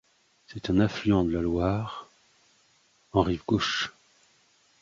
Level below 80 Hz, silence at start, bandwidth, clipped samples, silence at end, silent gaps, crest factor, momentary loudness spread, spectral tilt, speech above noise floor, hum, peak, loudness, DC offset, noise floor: -46 dBFS; 0.5 s; 7.6 kHz; under 0.1%; 0.9 s; none; 20 dB; 13 LU; -6 dB/octave; 39 dB; none; -8 dBFS; -27 LUFS; under 0.1%; -65 dBFS